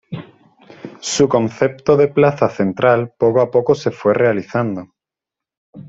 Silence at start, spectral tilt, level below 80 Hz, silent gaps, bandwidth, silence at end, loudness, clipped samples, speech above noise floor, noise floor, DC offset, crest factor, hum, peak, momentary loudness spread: 0.1 s; -5.5 dB/octave; -56 dBFS; 5.57-5.73 s; 8 kHz; 0 s; -16 LUFS; under 0.1%; 71 dB; -86 dBFS; under 0.1%; 16 dB; none; 0 dBFS; 15 LU